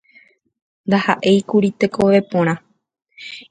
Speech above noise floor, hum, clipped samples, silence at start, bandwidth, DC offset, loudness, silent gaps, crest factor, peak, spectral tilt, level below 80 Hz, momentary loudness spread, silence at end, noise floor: 36 dB; none; under 0.1%; 0.85 s; 9.2 kHz; under 0.1%; -17 LUFS; none; 18 dB; 0 dBFS; -6.5 dB/octave; -56 dBFS; 18 LU; 0.1 s; -52 dBFS